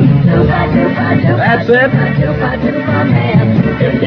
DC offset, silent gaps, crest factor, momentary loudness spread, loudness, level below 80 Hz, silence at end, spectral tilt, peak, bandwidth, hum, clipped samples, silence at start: under 0.1%; none; 10 dB; 4 LU; -11 LUFS; -30 dBFS; 0 s; -10 dB/octave; 0 dBFS; 5.6 kHz; none; 0.2%; 0 s